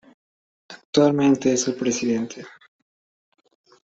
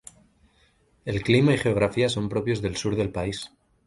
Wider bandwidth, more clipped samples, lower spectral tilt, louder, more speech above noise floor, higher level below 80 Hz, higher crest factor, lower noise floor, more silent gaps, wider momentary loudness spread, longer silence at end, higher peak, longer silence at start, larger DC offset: second, 8 kHz vs 11.5 kHz; neither; second, -4.5 dB/octave vs -6 dB/octave; first, -21 LUFS vs -24 LUFS; first, over 70 dB vs 39 dB; second, -64 dBFS vs -48 dBFS; about the same, 20 dB vs 20 dB; first, under -90 dBFS vs -63 dBFS; first, 0.85-0.93 s vs none; about the same, 11 LU vs 13 LU; first, 1.35 s vs 0.4 s; about the same, -4 dBFS vs -4 dBFS; second, 0.7 s vs 1.05 s; neither